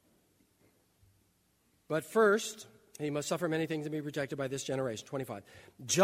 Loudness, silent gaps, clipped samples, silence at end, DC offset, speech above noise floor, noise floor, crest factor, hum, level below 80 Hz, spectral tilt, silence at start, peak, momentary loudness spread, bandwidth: -34 LUFS; none; under 0.1%; 0 s; under 0.1%; 39 dB; -72 dBFS; 22 dB; none; -76 dBFS; -4 dB/octave; 1.9 s; -12 dBFS; 16 LU; 16 kHz